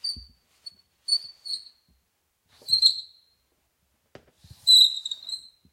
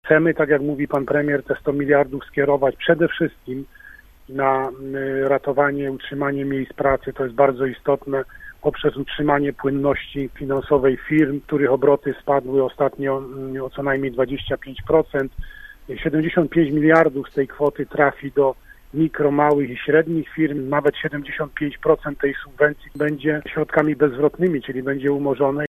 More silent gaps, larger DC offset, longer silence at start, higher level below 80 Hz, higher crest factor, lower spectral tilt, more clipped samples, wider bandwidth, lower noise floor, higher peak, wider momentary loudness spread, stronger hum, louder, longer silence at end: neither; neither; about the same, 0.05 s vs 0.05 s; second, -64 dBFS vs -44 dBFS; about the same, 22 dB vs 20 dB; second, 1.5 dB/octave vs -8.5 dB/octave; neither; first, 16.5 kHz vs 13.5 kHz; first, -73 dBFS vs -45 dBFS; second, -6 dBFS vs 0 dBFS; first, 22 LU vs 9 LU; neither; about the same, -20 LUFS vs -20 LUFS; first, 0.35 s vs 0 s